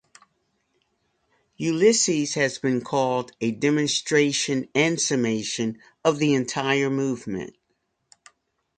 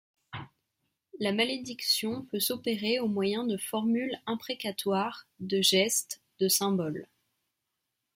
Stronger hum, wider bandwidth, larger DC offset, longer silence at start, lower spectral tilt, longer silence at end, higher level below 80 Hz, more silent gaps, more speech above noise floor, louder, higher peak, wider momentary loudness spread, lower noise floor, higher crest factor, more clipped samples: neither; second, 9.6 kHz vs 16.5 kHz; neither; first, 1.6 s vs 0.3 s; about the same, -4 dB/octave vs -3 dB/octave; first, 1.3 s vs 1.1 s; first, -66 dBFS vs -74 dBFS; neither; about the same, 51 dB vs 54 dB; first, -23 LUFS vs -29 LUFS; first, -4 dBFS vs -12 dBFS; second, 8 LU vs 14 LU; second, -74 dBFS vs -84 dBFS; about the same, 20 dB vs 20 dB; neither